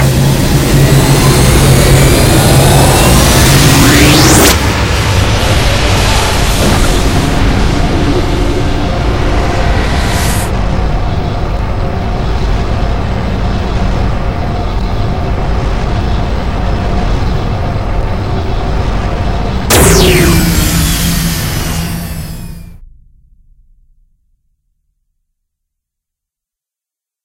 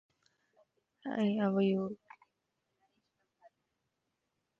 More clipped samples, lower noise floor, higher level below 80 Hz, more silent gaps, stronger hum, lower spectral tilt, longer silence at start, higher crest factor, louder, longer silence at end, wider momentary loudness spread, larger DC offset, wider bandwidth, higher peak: first, 0.8% vs under 0.1%; about the same, -85 dBFS vs -84 dBFS; first, -16 dBFS vs -80 dBFS; neither; neither; second, -4.5 dB/octave vs -8.5 dB/octave; second, 0 s vs 1.05 s; second, 10 dB vs 18 dB; first, -10 LUFS vs -33 LUFS; second, 0 s vs 2.65 s; second, 10 LU vs 16 LU; neither; first, over 20 kHz vs 5.2 kHz; first, 0 dBFS vs -22 dBFS